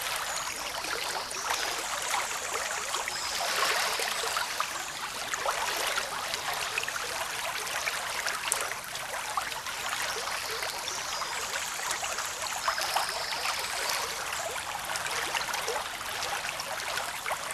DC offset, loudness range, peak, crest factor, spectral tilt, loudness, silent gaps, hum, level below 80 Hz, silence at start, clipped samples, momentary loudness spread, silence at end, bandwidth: under 0.1%; 2 LU; -4 dBFS; 28 dB; 0.5 dB/octave; -31 LUFS; none; none; -62 dBFS; 0 s; under 0.1%; 4 LU; 0 s; 14 kHz